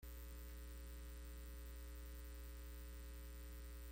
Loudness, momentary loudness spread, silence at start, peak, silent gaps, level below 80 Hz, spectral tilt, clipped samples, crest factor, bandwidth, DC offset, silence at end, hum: -55 LUFS; 0 LU; 0 s; -44 dBFS; none; -54 dBFS; -4.5 dB/octave; under 0.1%; 8 dB; 17 kHz; under 0.1%; 0 s; none